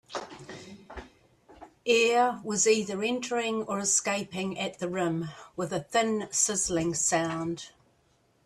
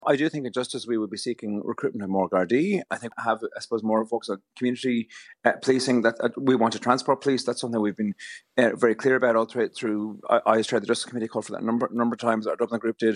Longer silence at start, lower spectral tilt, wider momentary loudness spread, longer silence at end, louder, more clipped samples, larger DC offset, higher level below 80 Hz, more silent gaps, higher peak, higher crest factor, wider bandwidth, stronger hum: about the same, 0.1 s vs 0 s; second, -3 dB/octave vs -5 dB/octave; first, 20 LU vs 9 LU; first, 0.8 s vs 0 s; about the same, -27 LUFS vs -25 LUFS; neither; neither; first, -62 dBFS vs -80 dBFS; neither; second, -10 dBFS vs -4 dBFS; about the same, 18 dB vs 22 dB; first, 14 kHz vs 11 kHz; neither